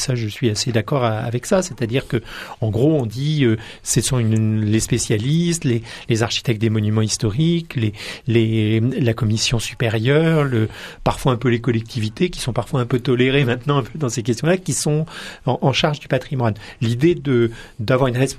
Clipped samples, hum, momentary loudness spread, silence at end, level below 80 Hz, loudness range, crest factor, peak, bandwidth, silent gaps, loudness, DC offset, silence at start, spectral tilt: under 0.1%; none; 7 LU; 0 s; -42 dBFS; 2 LU; 16 dB; -2 dBFS; 14 kHz; none; -19 LUFS; under 0.1%; 0 s; -5.5 dB/octave